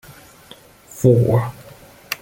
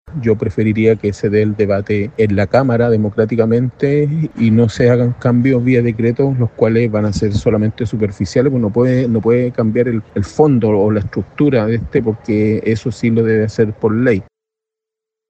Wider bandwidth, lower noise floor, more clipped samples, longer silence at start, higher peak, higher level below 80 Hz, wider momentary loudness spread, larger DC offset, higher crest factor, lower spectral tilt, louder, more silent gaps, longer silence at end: first, 17 kHz vs 8.2 kHz; second, -45 dBFS vs -84 dBFS; neither; first, 0.95 s vs 0.05 s; about the same, -2 dBFS vs 0 dBFS; second, -50 dBFS vs -42 dBFS; first, 17 LU vs 5 LU; neither; about the same, 18 dB vs 14 dB; second, -7 dB/octave vs -8.5 dB/octave; second, -18 LUFS vs -15 LUFS; neither; second, 0.05 s vs 1.05 s